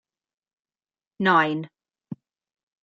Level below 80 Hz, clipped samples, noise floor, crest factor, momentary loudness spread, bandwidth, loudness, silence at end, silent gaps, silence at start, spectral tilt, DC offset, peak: -76 dBFS; under 0.1%; under -90 dBFS; 22 dB; 22 LU; 7.6 kHz; -22 LUFS; 0.7 s; none; 1.2 s; -7 dB/octave; under 0.1%; -6 dBFS